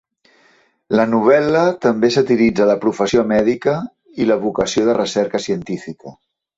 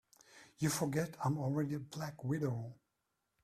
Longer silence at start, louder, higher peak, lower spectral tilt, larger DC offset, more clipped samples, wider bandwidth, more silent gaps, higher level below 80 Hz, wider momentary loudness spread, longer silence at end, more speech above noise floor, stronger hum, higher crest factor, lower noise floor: first, 0.9 s vs 0.35 s; first, -16 LUFS vs -38 LUFS; first, -2 dBFS vs -22 dBFS; about the same, -5.5 dB/octave vs -6 dB/octave; neither; neither; second, 8 kHz vs 15 kHz; neither; first, -50 dBFS vs -72 dBFS; first, 11 LU vs 8 LU; second, 0.45 s vs 0.7 s; second, 40 dB vs 48 dB; neither; about the same, 16 dB vs 18 dB; second, -55 dBFS vs -85 dBFS